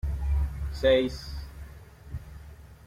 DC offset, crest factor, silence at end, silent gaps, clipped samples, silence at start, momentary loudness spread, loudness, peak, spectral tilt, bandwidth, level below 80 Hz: under 0.1%; 18 dB; 0.1 s; none; under 0.1%; 0.05 s; 24 LU; -27 LUFS; -10 dBFS; -6.5 dB/octave; 14 kHz; -34 dBFS